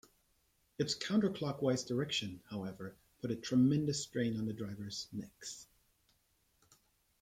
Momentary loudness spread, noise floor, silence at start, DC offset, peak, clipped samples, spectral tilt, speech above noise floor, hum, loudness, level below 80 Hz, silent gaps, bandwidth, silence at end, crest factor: 16 LU; -76 dBFS; 0.8 s; under 0.1%; -20 dBFS; under 0.1%; -5 dB/octave; 39 dB; none; -37 LUFS; -72 dBFS; none; 15.5 kHz; 1.6 s; 18 dB